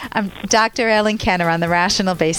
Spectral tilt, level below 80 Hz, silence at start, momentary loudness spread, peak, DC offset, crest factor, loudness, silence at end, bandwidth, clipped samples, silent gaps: -3.5 dB/octave; -40 dBFS; 0 s; 3 LU; -4 dBFS; under 0.1%; 14 dB; -17 LUFS; 0 s; 17.5 kHz; under 0.1%; none